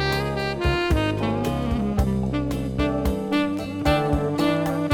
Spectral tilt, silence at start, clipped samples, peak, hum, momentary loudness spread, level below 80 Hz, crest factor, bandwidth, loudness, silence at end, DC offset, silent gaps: -6.5 dB/octave; 0 s; under 0.1%; -6 dBFS; none; 3 LU; -32 dBFS; 16 dB; 17.5 kHz; -23 LUFS; 0 s; under 0.1%; none